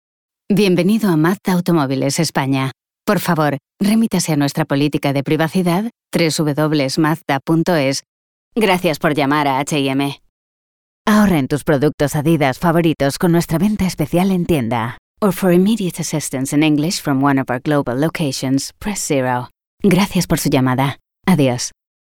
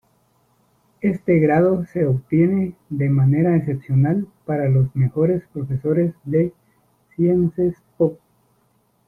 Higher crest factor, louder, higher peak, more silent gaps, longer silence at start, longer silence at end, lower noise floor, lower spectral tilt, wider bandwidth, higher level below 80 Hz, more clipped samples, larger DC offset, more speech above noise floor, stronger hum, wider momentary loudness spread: about the same, 14 dB vs 14 dB; first, -17 LUFS vs -20 LUFS; first, -2 dBFS vs -6 dBFS; first, 8.08-8.51 s, 10.29-11.05 s, 11.94-11.98 s, 14.99-15.15 s, 19.66-19.78 s vs none; second, 0.5 s vs 1.05 s; second, 0.4 s vs 0.9 s; first, under -90 dBFS vs -63 dBFS; second, -5.5 dB/octave vs -12 dB/octave; first, 19.5 kHz vs 2.8 kHz; first, -44 dBFS vs -50 dBFS; neither; neither; first, over 74 dB vs 44 dB; neither; about the same, 6 LU vs 8 LU